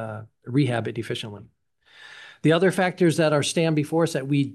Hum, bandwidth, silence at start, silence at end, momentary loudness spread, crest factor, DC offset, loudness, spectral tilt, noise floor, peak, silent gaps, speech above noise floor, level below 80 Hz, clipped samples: none; 12.5 kHz; 0 s; 0 s; 17 LU; 16 dB; under 0.1%; -23 LUFS; -5.5 dB/octave; -51 dBFS; -6 dBFS; none; 29 dB; -68 dBFS; under 0.1%